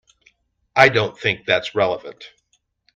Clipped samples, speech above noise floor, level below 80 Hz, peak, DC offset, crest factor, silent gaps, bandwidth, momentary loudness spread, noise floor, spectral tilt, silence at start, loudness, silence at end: under 0.1%; 48 dB; -58 dBFS; 0 dBFS; under 0.1%; 22 dB; none; 10.5 kHz; 12 LU; -67 dBFS; -4.5 dB/octave; 0.75 s; -18 LUFS; 0.7 s